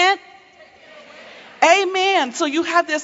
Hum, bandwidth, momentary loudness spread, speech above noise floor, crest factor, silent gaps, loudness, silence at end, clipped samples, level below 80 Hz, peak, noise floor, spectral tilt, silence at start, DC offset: none; 8 kHz; 6 LU; 28 dB; 18 dB; none; -17 LUFS; 0 s; under 0.1%; -72 dBFS; 0 dBFS; -47 dBFS; -0.5 dB/octave; 0 s; under 0.1%